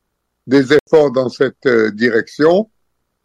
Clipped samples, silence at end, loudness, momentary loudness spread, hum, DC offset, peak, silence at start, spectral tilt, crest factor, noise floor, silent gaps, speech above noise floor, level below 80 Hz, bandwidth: under 0.1%; 0.6 s; -14 LUFS; 5 LU; none; under 0.1%; -2 dBFS; 0.45 s; -6 dB/octave; 14 dB; -69 dBFS; 0.80-0.86 s; 56 dB; -56 dBFS; 9.8 kHz